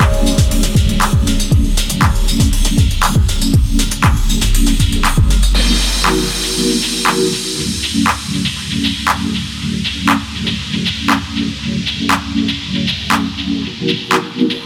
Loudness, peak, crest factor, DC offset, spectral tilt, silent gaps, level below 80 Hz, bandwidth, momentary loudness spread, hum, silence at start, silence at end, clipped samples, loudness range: -15 LUFS; 0 dBFS; 12 dB; under 0.1%; -4 dB/octave; none; -18 dBFS; 16.5 kHz; 5 LU; none; 0 s; 0 s; under 0.1%; 3 LU